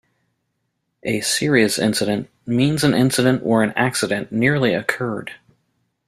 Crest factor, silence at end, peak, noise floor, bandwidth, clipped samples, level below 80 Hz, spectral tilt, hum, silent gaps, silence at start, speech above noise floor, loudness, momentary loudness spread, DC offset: 18 dB; 0.7 s; -2 dBFS; -73 dBFS; 15.5 kHz; under 0.1%; -56 dBFS; -4.5 dB/octave; none; none; 1.05 s; 55 dB; -19 LUFS; 9 LU; under 0.1%